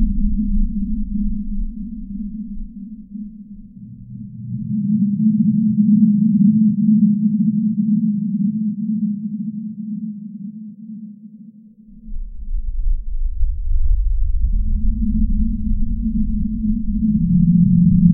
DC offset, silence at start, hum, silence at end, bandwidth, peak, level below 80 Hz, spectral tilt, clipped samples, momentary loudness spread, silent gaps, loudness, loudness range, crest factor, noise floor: under 0.1%; 0 s; none; 0 s; 0.5 kHz; 0 dBFS; -22 dBFS; -18 dB/octave; under 0.1%; 20 LU; none; -19 LUFS; 15 LU; 16 dB; -43 dBFS